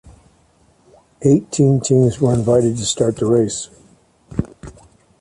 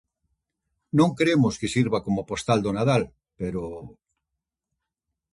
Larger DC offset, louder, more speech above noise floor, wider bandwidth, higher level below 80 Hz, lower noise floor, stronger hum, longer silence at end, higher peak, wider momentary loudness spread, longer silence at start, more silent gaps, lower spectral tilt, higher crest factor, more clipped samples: neither; first, -17 LUFS vs -24 LUFS; second, 40 dB vs 61 dB; about the same, 11.5 kHz vs 11.5 kHz; first, -44 dBFS vs -54 dBFS; second, -55 dBFS vs -84 dBFS; neither; second, 0.5 s vs 1.45 s; first, -2 dBFS vs -8 dBFS; about the same, 12 LU vs 13 LU; first, 1.2 s vs 0.95 s; neither; about the same, -6.5 dB/octave vs -6 dB/octave; about the same, 16 dB vs 18 dB; neither